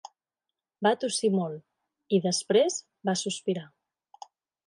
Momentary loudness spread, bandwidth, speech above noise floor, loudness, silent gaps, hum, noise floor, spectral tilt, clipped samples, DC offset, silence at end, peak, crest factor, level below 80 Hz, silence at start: 9 LU; 11.5 kHz; 62 dB; -28 LUFS; none; none; -89 dBFS; -4 dB/octave; under 0.1%; under 0.1%; 1 s; -10 dBFS; 18 dB; -80 dBFS; 0.8 s